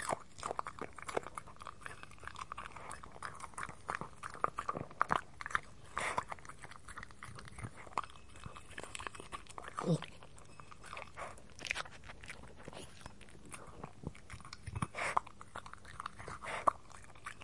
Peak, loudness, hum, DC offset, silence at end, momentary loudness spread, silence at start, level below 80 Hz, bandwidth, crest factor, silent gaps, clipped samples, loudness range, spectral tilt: -12 dBFS; -43 LUFS; none; 0.2%; 0 s; 15 LU; 0 s; -62 dBFS; 11.5 kHz; 32 dB; none; under 0.1%; 7 LU; -4 dB/octave